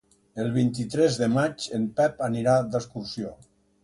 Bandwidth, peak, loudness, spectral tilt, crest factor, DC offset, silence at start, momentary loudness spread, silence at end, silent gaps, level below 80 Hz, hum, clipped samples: 11.5 kHz; -10 dBFS; -26 LUFS; -6 dB/octave; 16 dB; under 0.1%; 0.35 s; 12 LU; 0.5 s; none; -58 dBFS; none; under 0.1%